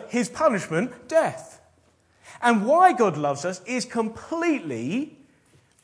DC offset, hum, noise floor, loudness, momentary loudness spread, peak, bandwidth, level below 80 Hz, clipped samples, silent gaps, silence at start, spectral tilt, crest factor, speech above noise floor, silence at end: under 0.1%; none; -62 dBFS; -23 LUFS; 11 LU; -4 dBFS; 11 kHz; -66 dBFS; under 0.1%; none; 0 s; -5 dB/octave; 20 dB; 39 dB; 0.75 s